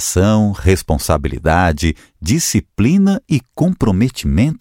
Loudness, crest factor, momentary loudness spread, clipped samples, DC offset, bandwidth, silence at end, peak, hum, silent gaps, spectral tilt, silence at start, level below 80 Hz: -15 LUFS; 14 dB; 6 LU; under 0.1%; under 0.1%; 17 kHz; 0.05 s; 0 dBFS; none; none; -5.5 dB/octave; 0 s; -28 dBFS